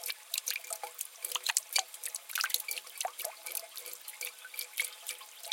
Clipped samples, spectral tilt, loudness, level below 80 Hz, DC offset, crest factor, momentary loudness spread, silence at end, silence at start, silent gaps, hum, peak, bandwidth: under 0.1%; 5.5 dB/octave; -36 LUFS; under -90 dBFS; under 0.1%; 36 dB; 11 LU; 0 s; 0 s; none; none; -2 dBFS; 17 kHz